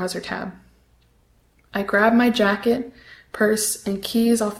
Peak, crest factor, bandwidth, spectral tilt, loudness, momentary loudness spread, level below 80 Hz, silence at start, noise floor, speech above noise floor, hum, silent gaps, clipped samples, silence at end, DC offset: -4 dBFS; 18 dB; 16 kHz; -4 dB/octave; -21 LUFS; 14 LU; -54 dBFS; 0 s; -59 dBFS; 38 dB; none; none; under 0.1%; 0 s; under 0.1%